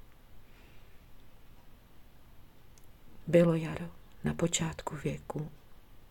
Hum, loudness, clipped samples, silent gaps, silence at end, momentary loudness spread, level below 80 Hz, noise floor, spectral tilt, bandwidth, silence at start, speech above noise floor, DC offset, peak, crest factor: none; -32 LUFS; under 0.1%; none; 0.05 s; 18 LU; -56 dBFS; -53 dBFS; -5.5 dB/octave; 17 kHz; 0.1 s; 22 dB; under 0.1%; -12 dBFS; 22 dB